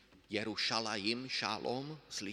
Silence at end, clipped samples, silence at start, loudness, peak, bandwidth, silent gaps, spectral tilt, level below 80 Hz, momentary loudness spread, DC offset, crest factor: 0 s; under 0.1%; 0.1 s; -37 LUFS; -18 dBFS; 14.5 kHz; none; -3 dB/octave; -74 dBFS; 8 LU; under 0.1%; 22 dB